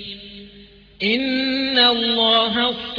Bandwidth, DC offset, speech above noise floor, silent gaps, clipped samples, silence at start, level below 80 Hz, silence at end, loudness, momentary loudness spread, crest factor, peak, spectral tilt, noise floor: 5.4 kHz; under 0.1%; 27 dB; none; under 0.1%; 0 s; -52 dBFS; 0 s; -17 LUFS; 18 LU; 16 dB; -4 dBFS; -5 dB/octave; -46 dBFS